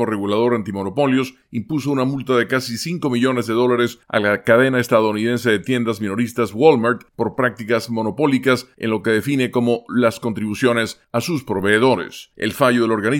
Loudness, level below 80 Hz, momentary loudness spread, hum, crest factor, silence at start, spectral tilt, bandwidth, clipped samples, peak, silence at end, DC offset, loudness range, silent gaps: -19 LUFS; -60 dBFS; 8 LU; none; 18 dB; 0 s; -5.5 dB/octave; 17 kHz; under 0.1%; 0 dBFS; 0 s; under 0.1%; 3 LU; none